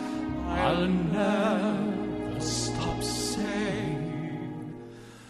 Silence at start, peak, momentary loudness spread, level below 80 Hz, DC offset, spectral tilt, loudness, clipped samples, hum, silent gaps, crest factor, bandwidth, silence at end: 0 s; -12 dBFS; 11 LU; -46 dBFS; under 0.1%; -5 dB/octave; -29 LUFS; under 0.1%; none; none; 16 dB; 13 kHz; 0 s